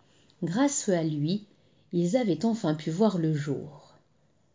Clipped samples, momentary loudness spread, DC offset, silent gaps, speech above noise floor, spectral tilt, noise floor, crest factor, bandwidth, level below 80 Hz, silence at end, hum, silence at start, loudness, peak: under 0.1%; 9 LU; under 0.1%; none; 41 dB; -6 dB/octave; -68 dBFS; 18 dB; 7.8 kHz; -72 dBFS; 0.75 s; none; 0.4 s; -28 LUFS; -12 dBFS